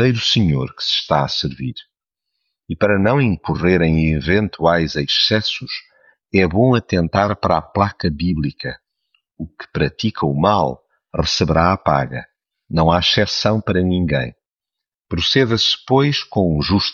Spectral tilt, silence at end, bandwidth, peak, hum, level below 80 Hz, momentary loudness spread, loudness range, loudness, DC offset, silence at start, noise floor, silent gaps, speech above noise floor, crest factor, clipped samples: -5.5 dB/octave; 0 s; 7.2 kHz; -2 dBFS; none; -38 dBFS; 13 LU; 4 LU; -17 LUFS; under 0.1%; 0 s; -84 dBFS; 14.49-14.53 s; 67 dB; 16 dB; under 0.1%